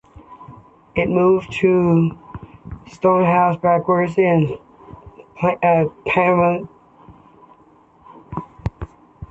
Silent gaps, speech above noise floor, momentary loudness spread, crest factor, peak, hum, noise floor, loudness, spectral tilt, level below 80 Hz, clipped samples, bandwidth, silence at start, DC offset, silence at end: none; 35 dB; 22 LU; 16 dB; -4 dBFS; none; -51 dBFS; -17 LUFS; -8.5 dB/octave; -44 dBFS; under 0.1%; 8 kHz; 0.3 s; under 0.1%; 0.05 s